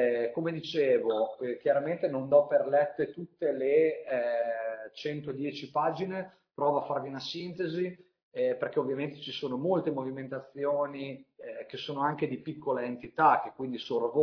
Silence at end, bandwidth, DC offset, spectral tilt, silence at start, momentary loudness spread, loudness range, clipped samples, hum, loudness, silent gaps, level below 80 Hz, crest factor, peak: 0 s; 5.4 kHz; under 0.1%; -7 dB/octave; 0 s; 12 LU; 5 LU; under 0.1%; none; -31 LUFS; 8.23-8.31 s; -76 dBFS; 20 dB; -10 dBFS